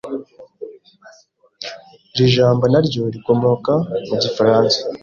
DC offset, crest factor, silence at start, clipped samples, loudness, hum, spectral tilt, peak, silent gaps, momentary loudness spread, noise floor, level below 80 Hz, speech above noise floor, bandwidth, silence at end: under 0.1%; 16 dB; 0.05 s; under 0.1%; -16 LUFS; none; -6.5 dB/octave; -2 dBFS; none; 19 LU; -52 dBFS; -52 dBFS; 37 dB; 7.4 kHz; 0.05 s